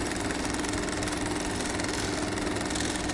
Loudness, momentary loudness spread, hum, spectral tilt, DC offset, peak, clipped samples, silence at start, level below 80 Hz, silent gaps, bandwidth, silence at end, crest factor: -30 LUFS; 1 LU; none; -3.5 dB/octave; under 0.1%; -14 dBFS; under 0.1%; 0 s; -42 dBFS; none; 11.5 kHz; 0 s; 16 dB